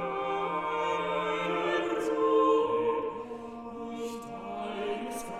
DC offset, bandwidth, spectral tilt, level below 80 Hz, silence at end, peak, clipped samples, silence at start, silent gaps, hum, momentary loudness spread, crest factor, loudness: under 0.1%; 13.5 kHz; -5 dB/octave; -64 dBFS; 0 s; -14 dBFS; under 0.1%; 0 s; none; none; 15 LU; 16 dB; -30 LUFS